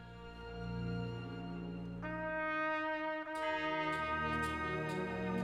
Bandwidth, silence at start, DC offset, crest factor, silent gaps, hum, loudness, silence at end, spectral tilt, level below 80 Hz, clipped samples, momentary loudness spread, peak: 14.5 kHz; 0 s; under 0.1%; 14 dB; none; none; -39 LUFS; 0 s; -6.5 dB/octave; -56 dBFS; under 0.1%; 9 LU; -24 dBFS